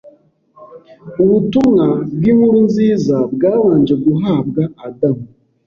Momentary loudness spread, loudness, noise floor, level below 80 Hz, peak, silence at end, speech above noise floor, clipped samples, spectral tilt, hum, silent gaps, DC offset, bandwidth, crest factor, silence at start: 8 LU; -14 LUFS; -49 dBFS; -50 dBFS; -2 dBFS; 0.4 s; 36 dB; under 0.1%; -9 dB/octave; none; none; under 0.1%; 7 kHz; 12 dB; 0.05 s